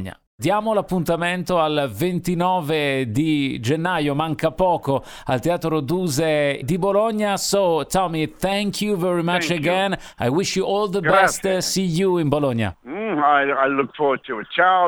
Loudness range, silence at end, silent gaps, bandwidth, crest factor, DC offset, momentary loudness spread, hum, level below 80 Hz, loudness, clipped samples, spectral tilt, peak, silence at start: 2 LU; 0 s; 0.27-0.38 s; 20 kHz; 18 dB; under 0.1%; 6 LU; none; -48 dBFS; -20 LUFS; under 0.1%; -5 dB/octave; -2 dBFS; 0 s